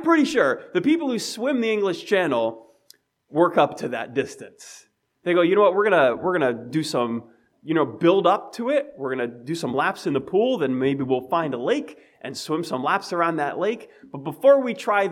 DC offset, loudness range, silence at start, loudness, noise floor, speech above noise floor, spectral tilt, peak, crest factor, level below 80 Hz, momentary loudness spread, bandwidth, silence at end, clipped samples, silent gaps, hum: under 0.1%; 3 LU; 0 s; -22 LUFS; -57 dBFS; 35 dB; -5.5 dB/octave; -4 dBFS; 18 dB; -70 dBFS; 15 LU; 15 kHz; 0 s; under 0.1%; none; none